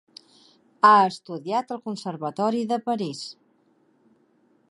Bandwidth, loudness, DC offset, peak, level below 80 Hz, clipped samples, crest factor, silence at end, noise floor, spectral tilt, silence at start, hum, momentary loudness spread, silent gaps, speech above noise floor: 11.5 kHz; -23 LUFS; under 0.1%; -2 dBFS; -80 dBFS; under 0.1%; 22 dB; 1.4 s; -63 dBFS; -5 dB/octave; 0.85 s; none; 17 LU; none; 41 dB